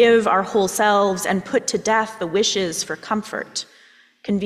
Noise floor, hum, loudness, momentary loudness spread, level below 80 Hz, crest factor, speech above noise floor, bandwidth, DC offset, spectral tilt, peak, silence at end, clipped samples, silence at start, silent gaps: -50 dBFS; none; -20 LUFS; 11 LU; -60 dBFS; 16 dB; 31 dB; 15.5 kHz; under 0.1%; -3.5 dB/octave; -4 dBFS; 0 s; under 0.1%; 0 s; none